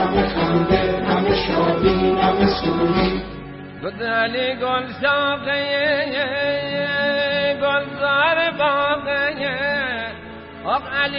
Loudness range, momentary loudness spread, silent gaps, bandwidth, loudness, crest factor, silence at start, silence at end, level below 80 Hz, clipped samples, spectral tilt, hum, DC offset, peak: 3 LU; 9 LU; none; 5.8 kHz; -19 LUFS; 18 dB; 0 s; 0 s; -40 dBFS; under 0.1%; -9.5 dB/octave; none; under 0.1%; -2 dBFS